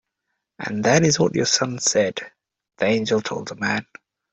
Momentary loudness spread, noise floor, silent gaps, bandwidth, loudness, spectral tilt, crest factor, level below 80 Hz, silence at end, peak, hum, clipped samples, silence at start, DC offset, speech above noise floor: 12 LU; -78 dBFS; none; 8.2 kHz; -21 LUFS; -3.5 dB/octave; 20 dB; -58 dBFS; 0.5 s; -2 dBFS; none; under 0.1%; 0.6 s; under 0.1%; 58 dB